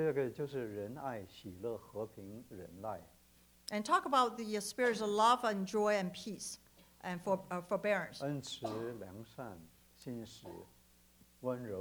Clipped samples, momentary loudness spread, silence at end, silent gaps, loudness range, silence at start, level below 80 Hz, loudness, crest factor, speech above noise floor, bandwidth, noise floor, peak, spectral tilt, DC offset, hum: under 0.1%; 19 LU; 0 s; none; 12 LU; 0 s; -72 dBFS; -37 LUFS; 22 dB; 29 dB; over 20 kHz; -66 dBFS; -16 dBFS; -4.5 dB/octave; under 0.1%; none